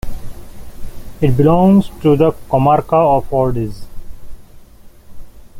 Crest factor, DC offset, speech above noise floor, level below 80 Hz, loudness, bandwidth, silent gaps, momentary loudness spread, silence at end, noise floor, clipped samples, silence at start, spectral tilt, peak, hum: 14 dB; under 0.1%; 27 dB; -32 dBFS; -14 LUFS; 16 kHz; none; 13 LU; 0 s; -39 dBFS; under 0.1%; 0.05 s; -9 dB/octave; -2 dBFS; none